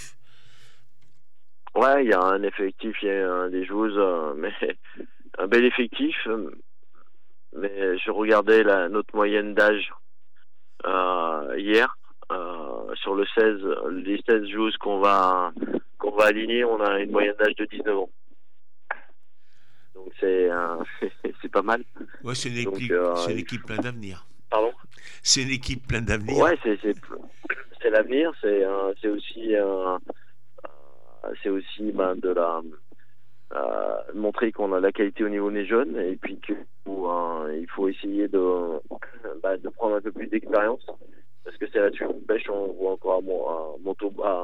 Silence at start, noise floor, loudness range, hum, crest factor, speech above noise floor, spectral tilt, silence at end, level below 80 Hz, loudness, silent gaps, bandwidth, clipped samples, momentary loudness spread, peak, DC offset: 0 s; -78 dBFS; 6 LU; none; 20 dB; 54 dB; -4 dB/octave; 0 s; -52 dBFS; -25 LUFS; none; 12 kHz; under 0.1%; 14 LU; -4 dBFS; 2%